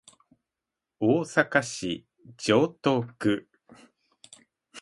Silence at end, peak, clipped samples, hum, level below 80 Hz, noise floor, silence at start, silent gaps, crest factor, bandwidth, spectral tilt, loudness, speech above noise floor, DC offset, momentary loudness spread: 0 s; -6 dBFS; under 0.1%; none; -66 dBFS; -88 dBFS; 1 s; none; 24 dB; 11.5 kHz; -5 dB/octave; -26 LUFS; 62 dB; under 0.1%; 9 LU